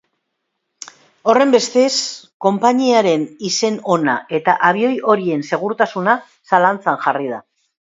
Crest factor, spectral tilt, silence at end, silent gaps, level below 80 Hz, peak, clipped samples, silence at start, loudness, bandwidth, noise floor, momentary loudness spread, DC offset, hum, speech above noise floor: 16 dB; -4 dB/octave; 0.55 s; 2.34-2.40 s; -68 dBFS; 0 dBFS; under 0.1%; 1.25 s; -16 LUFS; 7.8 kHz; -74 dBFS; 10 LU; under 0.1%; none; 58 dB